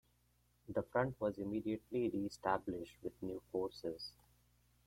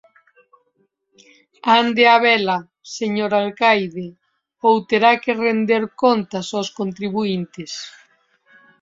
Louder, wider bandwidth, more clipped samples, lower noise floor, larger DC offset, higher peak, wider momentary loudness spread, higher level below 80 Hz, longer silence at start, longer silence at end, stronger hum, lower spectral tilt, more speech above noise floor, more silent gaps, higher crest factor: second, -42 LUFS vs -18 LUFS; first, 16.5 kHz vs 7.8 kHz; neither; first, -76 dBFS vs -66 dBFS; neither; second, -20 dBFS vs -2 dBFS; second, 9 LU vs 17 LU; about the same, -68 dBFS vs -66 dBFS; second, 0.7 s vs 1.65 s; second, 0.75 s vs 0.9 s; first, 60 Hz at -65 dBFS vs none; first, -6.5 dB/octave vs -4.5 dB/octave; second, 35 dB vs 48 dB; neither; about the same, 22 dB vs 18 dB